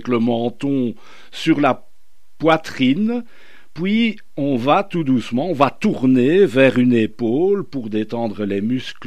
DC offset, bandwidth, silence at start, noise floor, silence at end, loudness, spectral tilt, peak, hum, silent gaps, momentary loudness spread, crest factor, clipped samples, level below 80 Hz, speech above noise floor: 2%; 10.5 kHz; 0.05 s; -60 dBFS; 0 s; -18 LUFS; -7 dB/octave; 0 dBFS; none; none; 11 LU; 18 dB; under 0.1%; -58 dBFS; 42 dB